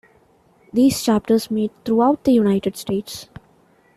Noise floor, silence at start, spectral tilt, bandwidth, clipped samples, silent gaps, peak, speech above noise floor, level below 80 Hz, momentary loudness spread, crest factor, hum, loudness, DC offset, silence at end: -56 dBFS; 0.75 s; -5.5 dB/octave; 14.5 kHz; under 0.1%; none; -6 dBFS; 38 dB; -54 dBFS; 9 LU; 14 dB; none; -19 LUFS; under 0.1%; 0.7 s